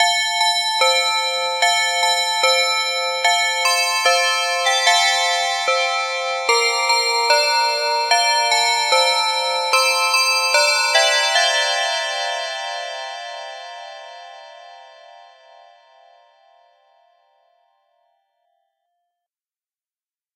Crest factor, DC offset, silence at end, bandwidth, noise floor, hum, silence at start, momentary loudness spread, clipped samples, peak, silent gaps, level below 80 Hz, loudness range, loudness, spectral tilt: 16 dB; under 0.1%; 5.55 s; 16 kHz; under -90 dBFS; none; 0 s; 12 LU; under 0.1%; -4 dBFS; none; -88 dBFS; 12 LU; -16 LUFS; 5.5 dB/octave